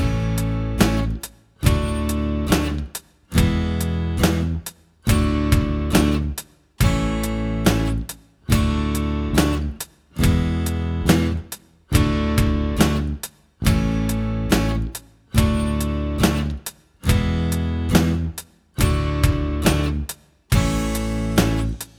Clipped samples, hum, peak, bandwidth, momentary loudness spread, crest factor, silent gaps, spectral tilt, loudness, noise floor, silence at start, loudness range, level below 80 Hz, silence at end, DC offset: under 0.1%; none; -2 dBFS; 18.5 kHz; 12 LU; 18 dB; none; -5.5 dB/octave; -21 LUFS; -40 dBFS; 0 s; 1 LU; -26 dBFS; 0.15 s; under 0.1%